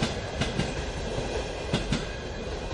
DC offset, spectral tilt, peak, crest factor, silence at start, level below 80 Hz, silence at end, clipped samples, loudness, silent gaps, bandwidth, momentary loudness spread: under 0.1%; -5 dB/octave; -12 dBFS; 20 dB; 0 s; -38 dBFS; 0 s; under 0.1%; -31 LUFS; none; 11.5 kHz; 6 LU